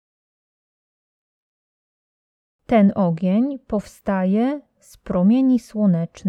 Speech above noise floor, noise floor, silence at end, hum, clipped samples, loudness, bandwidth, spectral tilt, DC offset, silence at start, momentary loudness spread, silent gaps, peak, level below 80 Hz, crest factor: over 71 dB; under -90 dBFS; 0 s; none; under 0.1%; -20 LUFS; 11.5 kHz; -9 dB/octave; under 0.1%; 2.7 s; 10 LU; none; -4 dBFS; -52 dBFS; 18 dB